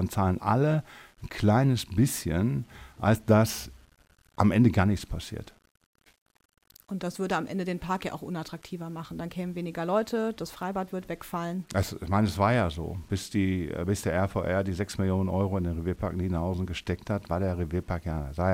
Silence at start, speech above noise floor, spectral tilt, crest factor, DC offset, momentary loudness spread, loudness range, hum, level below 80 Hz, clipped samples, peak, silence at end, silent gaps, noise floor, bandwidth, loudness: 0 s; 34 dB; -6.5 dB/octave; 22 dB; under 0.1%; 13 LU; 7 LU; none; -46 dBFS; under 0.1%; -6 dBFS; 0 s; 5.71-5.75 s, 5.86-5.93 s, 6.21-6.26 s, 6.45-6.49 s; -62 dBFS; 16 kHz; -29 LUFS